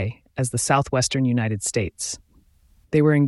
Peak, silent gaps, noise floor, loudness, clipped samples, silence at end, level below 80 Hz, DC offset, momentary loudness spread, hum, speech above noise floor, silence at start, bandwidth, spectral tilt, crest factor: -6 dBFS; none; -57 dBFS; -23 LUFS; under 0.1%; 0 s; -50 dBFS; under 0.1%; 10 LU; none; 36 dB; 0 s; 12 kHz; -5 dB/octave; 18 dB